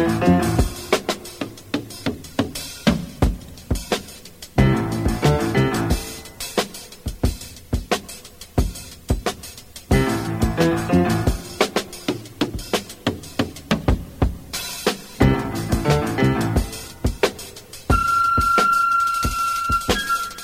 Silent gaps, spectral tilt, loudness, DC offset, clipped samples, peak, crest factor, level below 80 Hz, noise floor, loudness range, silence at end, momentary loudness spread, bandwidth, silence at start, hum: none; -5.5 dB/octave; -22 LUFS; under 0.1%; under 0.1%; -2 dBFS; 20 dB; -30 dBFS; -40 dBFS; 6 LU; 0 s; 13 LU; 16.5 kHz; 0 s; none